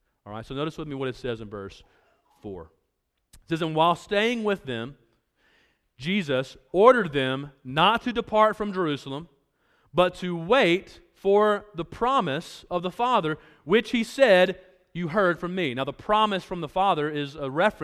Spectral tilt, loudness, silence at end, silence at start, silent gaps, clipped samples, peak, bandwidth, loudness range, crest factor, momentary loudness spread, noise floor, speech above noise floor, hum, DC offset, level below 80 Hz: -5.5 dB/octave; -24 LUFS; 0 s; 0.25 s; none; under 0.1%; -2 dBFS; 14.5 kHz; 5 LU; 22 dB; 16 LU; -77 dBFS; 52 dB; none; under 0.1%; -56 dBFS